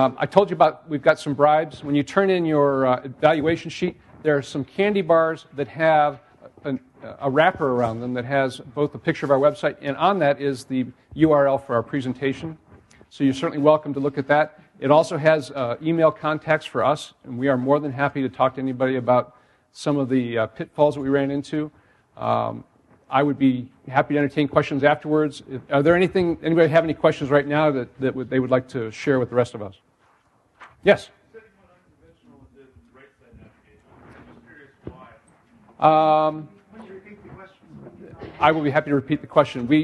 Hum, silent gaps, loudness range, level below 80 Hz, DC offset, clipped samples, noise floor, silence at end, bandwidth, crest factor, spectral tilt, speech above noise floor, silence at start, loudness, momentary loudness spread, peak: none; none; 5 LU; -58 dBFS; under 0.1%; under 0.1%; -61 dBFS; 0 s; 11.5 kHz; 20 dB; -7 dB/octave; 41 dB; 0 s; -21 LUFS; 12 LU; 0 dBFS